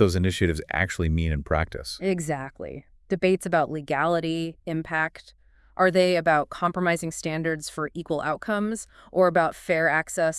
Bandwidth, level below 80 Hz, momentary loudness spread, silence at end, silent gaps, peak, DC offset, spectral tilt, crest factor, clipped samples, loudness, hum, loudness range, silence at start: 12 kHz; -44 dBFS; 10 LU; 0 s; none; -6 dBFS; under 0.1%; -5.5 dB/octave; 18 dB; under 0.1%; -25 LUFS; none; 2 LU; 0 s